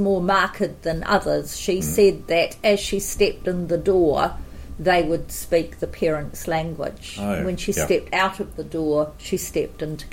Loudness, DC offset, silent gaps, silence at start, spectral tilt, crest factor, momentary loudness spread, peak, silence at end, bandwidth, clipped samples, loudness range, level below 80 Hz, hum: -22 LUFS; under 0.1%; none; 0 s; -4.5 dB/octave; 16 dB; 10 LU; -6 dBFS; 0 s; 16.5 kHz; under 0.1%; 4 LU; -38 dBFS; none